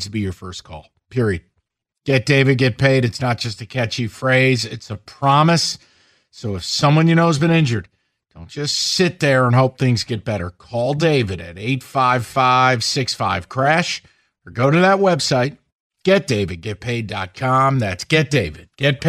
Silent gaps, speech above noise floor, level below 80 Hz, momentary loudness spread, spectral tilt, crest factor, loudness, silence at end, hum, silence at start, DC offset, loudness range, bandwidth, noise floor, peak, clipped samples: 15.72-15.90 s; 54 dB; -50 dBFS; 13 LU; -5 dB/octave; 16 dB; -18 LUFS; 0 s; none; 0 s; under 0.1%; 2 LU; 14.5 kHz; -71 dBFS; -2 dBFS; under 0.1%